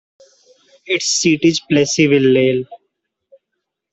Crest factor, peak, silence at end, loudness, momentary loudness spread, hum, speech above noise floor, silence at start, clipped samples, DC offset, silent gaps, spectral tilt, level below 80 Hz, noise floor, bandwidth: 16 dB; -2 dBFS; 1.15 s; -14 LUFS; 9 LU; none; 62 dB; 0.85 s; under 0.1%; under 0.1%; none; -4 dB/octave; -58 dBFS; -77 dBFS; 8.4 kHz